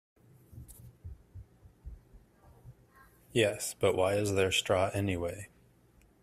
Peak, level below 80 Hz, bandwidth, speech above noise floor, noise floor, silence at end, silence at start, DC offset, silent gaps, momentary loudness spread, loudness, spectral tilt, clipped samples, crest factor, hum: -12 dBFS; -58 dBFS; 15.5 kHz; 34 dB; -64 dBFS; 0.75 s; 0.55 s; under 0.1%; none; 25 LU; -30 LUFS; -4 dB/octave; under 0.1%; 22 dB; none